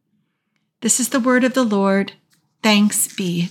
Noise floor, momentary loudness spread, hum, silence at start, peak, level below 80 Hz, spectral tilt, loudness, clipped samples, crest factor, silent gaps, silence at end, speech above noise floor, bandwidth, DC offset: -71 dBFS; 7 LU; none; 0.8 s; -2 dBFS; -80 dBFS; -3.5 dB/octave; -17 LUFS; under 0.1%; 16 dB; none; 0 s; 54 dB; 17 kHz; under 0.1%